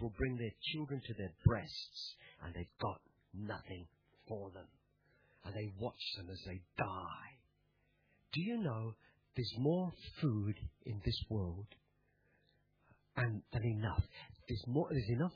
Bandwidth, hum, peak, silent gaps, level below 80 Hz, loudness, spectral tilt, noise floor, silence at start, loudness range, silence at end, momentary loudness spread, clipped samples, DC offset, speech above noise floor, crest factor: 5.4 kHz; none; -14 dBFS; none; -56 dBFS; -41 LUFS; -5.5 dB/octave; -77 dBFS; 0 s; 8 LU; 0 s; 16 LU; under 0.1%; under 0.1%; 37 dB; 26 dB